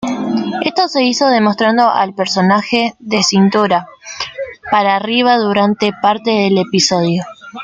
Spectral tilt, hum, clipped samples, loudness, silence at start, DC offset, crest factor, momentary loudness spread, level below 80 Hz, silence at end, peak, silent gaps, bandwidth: -4.5 dB/octave; none; under 0.1%; -13 LUFS; 0 s; under 0.1%; 14 dB; 8 LU; -56 dBFS; 0 s; 0 dBFS; none; 9.2 kHz